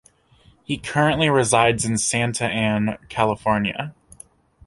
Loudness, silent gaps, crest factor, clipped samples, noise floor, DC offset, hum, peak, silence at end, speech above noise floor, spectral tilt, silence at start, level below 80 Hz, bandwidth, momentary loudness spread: -20 LUFS; none; 20 dB; under 0.1%; -55 dBFS; under 0.1%; none; -2 dBFS; 0.75 s; 35 dB; -4 dB/octave; 0.7 s; -48 dBFS; 11.5 kHz; 11 LU